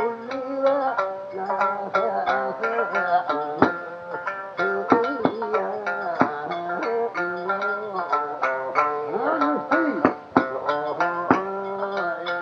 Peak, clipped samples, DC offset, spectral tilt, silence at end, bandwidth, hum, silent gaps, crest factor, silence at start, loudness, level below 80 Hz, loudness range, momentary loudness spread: 0 dBFS; under 0.1%; under 0.1%; -6.5 dB/octave; 0 s; 7.2 kHz; none; none; 24 dB; 0 s; -24 LUFS; -66 dBFS; 2 LU; 7 LU